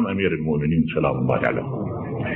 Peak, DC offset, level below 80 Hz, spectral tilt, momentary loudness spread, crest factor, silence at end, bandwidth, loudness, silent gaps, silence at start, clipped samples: -6 dBFS; under 0.1%; -44 dBFS; -6.5 dB/octave; 7 LU; 16 dB; 0 s; 4 kHz; -23 LUFS; none; 0 s; under 0.1%